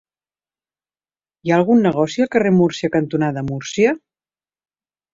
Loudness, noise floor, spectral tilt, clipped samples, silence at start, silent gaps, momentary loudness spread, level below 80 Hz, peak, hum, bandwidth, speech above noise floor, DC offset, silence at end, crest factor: -17 LUFS; under -90 dBFS; -6.5 dB/octave; under 0.1%; 1.45 s; none; 10 LU; -56 dBFS; -2 dBFS; none; 7.8 kHz; over 74 dB; under 0.1%; 1.15 s; 16 dB